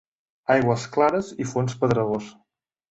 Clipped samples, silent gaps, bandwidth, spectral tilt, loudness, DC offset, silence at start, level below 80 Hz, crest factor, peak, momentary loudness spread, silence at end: under 0.1%; none; 8.2 kHz; -6.5 dB/octave; -23 LUFS; under 0.1%; 0.5 s; -56 dBFS; 18 dB; -6 dBFS; 10 LU; 0.6 s